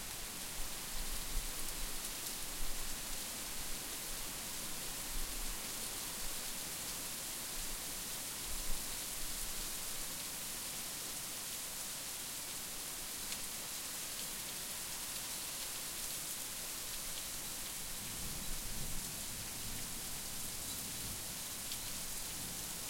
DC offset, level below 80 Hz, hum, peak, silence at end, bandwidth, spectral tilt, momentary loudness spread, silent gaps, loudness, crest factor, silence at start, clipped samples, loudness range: under 0.1%; -50 dBFS; none; -24 dBFS; 0 s; 16.5 kHz; -1 dB/octave; 1 LU; none; -41 LUFS; 18 dB; 0 s; under 0.1%; 1 LU